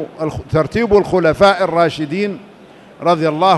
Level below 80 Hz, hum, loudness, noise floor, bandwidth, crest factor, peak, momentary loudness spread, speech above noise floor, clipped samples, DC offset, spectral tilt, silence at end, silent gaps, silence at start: -40 dBFS; none; -15 LUFS; -41 dBFS; 12 kHz; 14 dB; 0 dBFS; 11 LU; 27 dB; under 0.1%; under 0.1%; -6.5 dB/octave; 0 s; none; 0 s